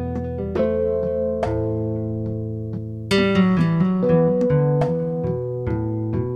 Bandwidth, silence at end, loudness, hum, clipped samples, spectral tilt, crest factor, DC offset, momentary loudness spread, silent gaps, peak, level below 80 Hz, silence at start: 10.5 kHz; 0 s; -21 LUFS; none; under 0.1%; -8 dB/octave; 16 dB; under 0.1%; 9 LU; none; -6 dBFS; -40 dBFS; 0 s